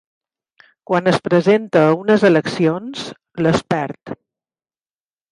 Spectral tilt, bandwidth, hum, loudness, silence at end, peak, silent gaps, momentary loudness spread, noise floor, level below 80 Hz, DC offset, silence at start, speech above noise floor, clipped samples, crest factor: -6.5 dB/octave; 11 kHz; none; -16 LUFS; 1.15 s; -2 dBFS; none; 16 LU; under -90 dBFS; -56 dBFS; under 0.1%; 0.9 s; over 74 dB; under 0.1%; 16 dB